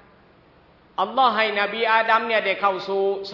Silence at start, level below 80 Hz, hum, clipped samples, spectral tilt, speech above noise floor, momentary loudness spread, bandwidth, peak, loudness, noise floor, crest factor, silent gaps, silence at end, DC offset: 1 s; -66 dBFS; none; under 0.1%; -5 dB/octave; 33 dB; 6 LU; 6 kHz; -4 dBFS; -21 LUFS; -54 dBFS; 18 dB; none; 0 s; under 0.1%